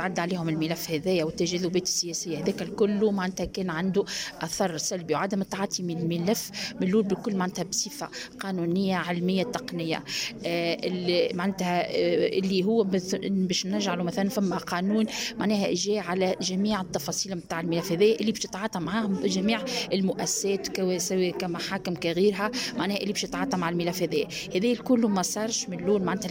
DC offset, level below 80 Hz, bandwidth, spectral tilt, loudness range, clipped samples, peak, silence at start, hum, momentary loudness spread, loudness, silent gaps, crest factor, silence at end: under 0.1%; -58 dBFS; 16.5 kHz; -4.5 dB/octave; 2 LU; under 0.1%; -12 dBFS; 0 s; none; 6 LU; -27 LUFS; none; 16 dB; 0 s